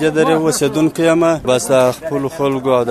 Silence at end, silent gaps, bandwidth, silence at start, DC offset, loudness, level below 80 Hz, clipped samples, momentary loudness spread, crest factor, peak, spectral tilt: 0 s; none; 13.5 kHz; 0 s; under 0.1%; -15 LUFS; -46 dBFS; under 0.1%; 5 LU; 14 dB; 0 dBFS; -5 dB/octave